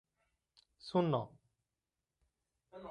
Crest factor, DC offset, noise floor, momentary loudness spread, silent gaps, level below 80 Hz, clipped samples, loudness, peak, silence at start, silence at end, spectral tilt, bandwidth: 22 dB; under 0.1%; under -90 dBFS; 20 LU; none; -78 dBFS; under 0.1%; -36 LUFS; -20 dBFS; 0.85 s; 0 s; -8.5 dB/octave; 10.5 kHz